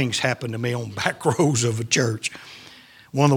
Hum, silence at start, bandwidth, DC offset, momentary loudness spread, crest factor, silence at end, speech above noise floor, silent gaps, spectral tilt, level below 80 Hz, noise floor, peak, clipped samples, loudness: none; 0 s; 17 kHz; under 0.1%; 13 LU; 22 dB; 0 s; 24 dB; none; -4.5 dB/octave; -60 dBFS; -47 dBFS; 0 dBFS; under 0.1%; -23 LUFS